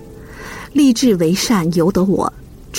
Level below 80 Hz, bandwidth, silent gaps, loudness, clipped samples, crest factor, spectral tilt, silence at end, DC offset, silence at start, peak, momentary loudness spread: -40 dBFS; 16.5 kHz; none; -15 LUFS; under 0.1%; 12 dB; -5.5 dB/octave; 0 s; under 0.1%; 0 s; -4 dBFS; 18 LU